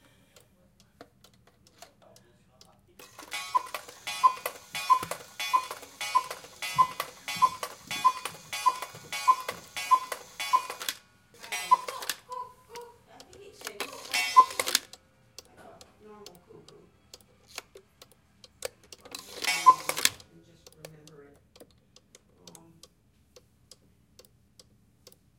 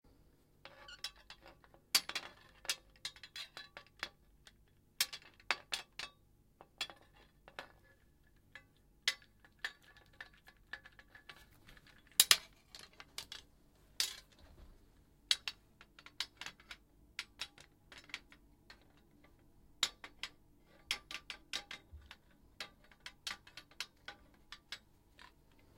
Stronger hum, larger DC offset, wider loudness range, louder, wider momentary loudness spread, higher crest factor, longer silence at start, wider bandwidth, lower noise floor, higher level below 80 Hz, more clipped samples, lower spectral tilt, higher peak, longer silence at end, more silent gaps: neither; neither; about the same, 11 LU vs 13 LU; first, -28 LUFS vs -40 LUFS; about the same, 26 LU vs 24 LU; second, 28 dB vs 42 dB; first, 1 s vs 0.65 s; about the same, 17 kHz vs 16.5 kHz; second, -65 dBFS vs -69 dBFS; about the same, -70 dBFS vs -70 dBFS; neither; first, 0 dB/octave vs 1.5 dB/octave; about the same, -4 dBFS vs -4 dBFS; first, 3.75 s vs 0.5 s; neither